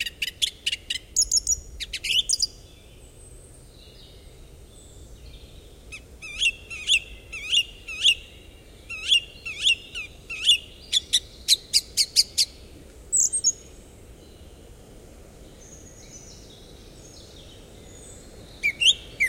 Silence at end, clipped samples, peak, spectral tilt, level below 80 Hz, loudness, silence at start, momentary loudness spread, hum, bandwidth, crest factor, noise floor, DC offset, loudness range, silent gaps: 0 s; under 0.1%; -4 dBFS; 1.5 dB/octave; -48 dBFS; -22 LUFS; 0 s; 24 LU; none; 16.5 kHz; 24 dB; -48 dBFS; under 0.1%; 11 LU; none